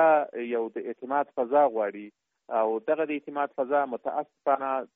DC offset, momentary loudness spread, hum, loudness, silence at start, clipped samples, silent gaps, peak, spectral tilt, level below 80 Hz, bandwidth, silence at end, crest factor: under 0.1%; 9 LU; none; -28 LUFS; 0 s; under 0.1%; none; -10 dBFS; -3.5 dB/octave; -80 dBFS; 3.8 kHz; 0.1 s; 16 dB